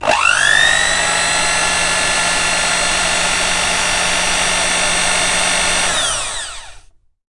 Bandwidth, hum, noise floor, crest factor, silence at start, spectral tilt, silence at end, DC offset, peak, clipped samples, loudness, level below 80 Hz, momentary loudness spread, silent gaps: 11.5 kHz; none; -43 dBFS; 16 dB; 0 s; 0 dB/octave; 0.5 s; under 0.1%; 0 dBFS; under 0.1%; -13 LUFS; -34 dBFS; 4 LU; none